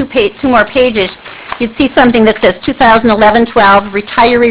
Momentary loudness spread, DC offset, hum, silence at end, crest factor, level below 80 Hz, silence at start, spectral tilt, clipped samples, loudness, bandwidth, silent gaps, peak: 10 LU; under 0.1%; none; 0 s; 8 dB; -34 dBFS; 0 s; -9 dB/octave; 0.8%; -9 LUFS; 4 kHz; none; 0 dBFS